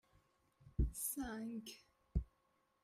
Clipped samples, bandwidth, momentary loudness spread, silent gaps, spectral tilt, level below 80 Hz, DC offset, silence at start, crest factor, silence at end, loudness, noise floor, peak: under 0.1%; 16 kHz; 16 LU; none; -5 dB/octave; -48 dBFS; under 0.1%; 0.65 s; 20 dB; 0.6 s; -44 LUFS; -80 dBFS; -26 dBFS